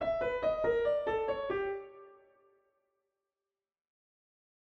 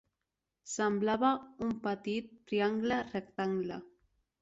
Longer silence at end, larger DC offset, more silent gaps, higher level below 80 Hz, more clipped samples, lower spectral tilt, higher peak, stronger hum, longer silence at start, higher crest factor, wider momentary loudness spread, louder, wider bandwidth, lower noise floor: first, 2.6 s vs 0.55 s; neither; neither; first, -60 dBFS vs -70 dBFS; neither; first, -6.5 dB/octave vs -5 dB/octave; second, -20 dBFS vs -16 dBFS; neither; second, 0 s vs 0.65 s; about the same, 16 dB vs 20 dB; about the same, 9 LU vs 10 LU; about the same, -33 LUFS vs -34 LUFS; second, 6.4 kHz vs 8 kHz; about the same, under -90 dBFS vs -88 dBFS